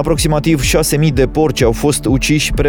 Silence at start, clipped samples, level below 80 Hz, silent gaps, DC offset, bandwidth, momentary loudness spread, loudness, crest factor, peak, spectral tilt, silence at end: 0 s; under 0.1%; -24 dBFS; none; under 0.1%; over 20 kHz; 1 LU; -13 LUFS; 12 dB; 0 dBFS; -5 dB/octave; 0 s